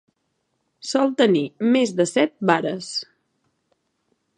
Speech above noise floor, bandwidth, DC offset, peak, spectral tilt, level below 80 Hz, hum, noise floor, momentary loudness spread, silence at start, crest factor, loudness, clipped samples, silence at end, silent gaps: 53 dB; 11 kHz; under 0.1%; -2 dBFS; -4.5 dB/octave; -76 dBFS; none; -73 dBFS; 10 LU; 0.85 s; 22 dB; -21 LUFS; under 0.1%; 1.35 s; none